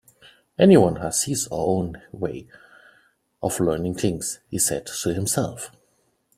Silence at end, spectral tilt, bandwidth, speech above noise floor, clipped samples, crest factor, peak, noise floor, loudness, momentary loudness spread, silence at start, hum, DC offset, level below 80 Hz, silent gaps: 0.7 s; -5 dB/octave; 16 kHz; 44 dB; under 0.1%; 22 dB; -2 dBFS; -67 dBFS; -22 LUFS; 16 LU; 0.6 s; none; under 0.1%; -52 dBFS; none